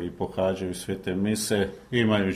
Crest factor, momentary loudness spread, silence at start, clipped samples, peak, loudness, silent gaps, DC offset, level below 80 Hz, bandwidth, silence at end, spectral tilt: 18 dB; 8 LU; 0 s; under 0.1%; -8 dBFS; -27 LUFS; none; under 0.1%; -54 dBFS; 15.5 kHz; 0 s; -5 dB/octave